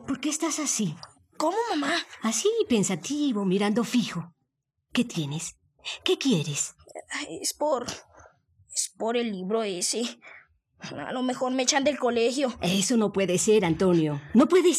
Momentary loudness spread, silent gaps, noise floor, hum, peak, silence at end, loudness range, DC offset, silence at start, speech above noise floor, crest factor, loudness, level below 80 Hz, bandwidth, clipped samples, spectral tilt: 13 LU; none; -79 dBFS; none; -6 dBFS; 0 s; 6 LU; under 0.1%; 0 s; 53 dB; 20 dB; -26 LUFS; -64 dBFS; 15 kHz; under 0.1%; -4 dB/octave